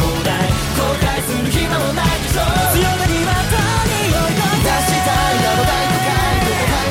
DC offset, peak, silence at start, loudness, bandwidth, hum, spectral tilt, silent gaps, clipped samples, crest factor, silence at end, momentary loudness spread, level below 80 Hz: under 0.1%; -4 dBFS; 0 s; -16 LUFS; 16.5 kHz; none; -4 dB/octave; none; under 0.1%; 10 dB; 0 s; 3 LU; -26 dBFS